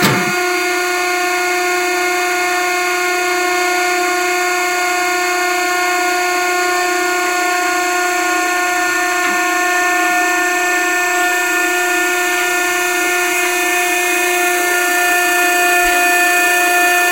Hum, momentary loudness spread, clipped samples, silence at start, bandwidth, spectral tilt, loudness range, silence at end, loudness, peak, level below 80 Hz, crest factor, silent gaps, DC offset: none; 4 LU; under 0.1%; 0 s; 16.5 kHz; -1.5 dB/octave; 2 LU; 0 s; -14 LUFS; 0 dBFS; -54 dBFS; 14 dB; none; 0.1%